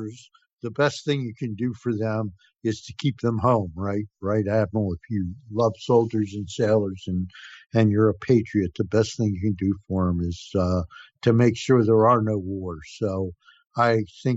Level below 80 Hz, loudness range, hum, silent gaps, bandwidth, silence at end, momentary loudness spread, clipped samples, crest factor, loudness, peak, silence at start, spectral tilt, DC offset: -56 dBFS; 4 LU; none; 0.53-0.57 s; 8 kHz; 0 s; 11 LU; under 0.1%; 18 dB; -24 LUFS; -6 dBFS; 0 s; -7.5 dB/octave; under 0.1%